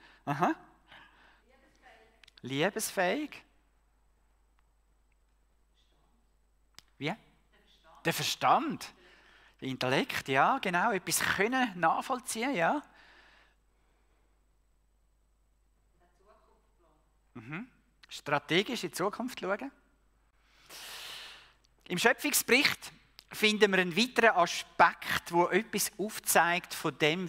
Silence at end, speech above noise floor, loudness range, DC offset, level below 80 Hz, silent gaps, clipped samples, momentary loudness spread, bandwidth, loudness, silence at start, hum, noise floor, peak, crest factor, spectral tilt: 0 s; 40 dB; 15 LU; under 0.1%; -68 dBFS; none; under 0.1%; 18 LU; 16 kHz; -29 LUFS; 0.25 s; none; -70 dBFS; -8 dBFS; 24 dB; -3 dB/octave